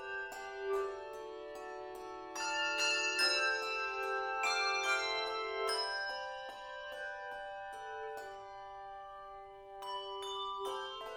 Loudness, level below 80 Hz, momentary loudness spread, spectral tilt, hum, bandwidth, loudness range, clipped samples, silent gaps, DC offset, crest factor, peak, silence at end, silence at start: -37 LUFS; -70 dBFS; 17 LU; 0 dB/octave; none; 16.5 kHz; 13 LU; under 0.1%; none; under 0.1%; 20 dB; -20 dBFS; 0 s; 0 s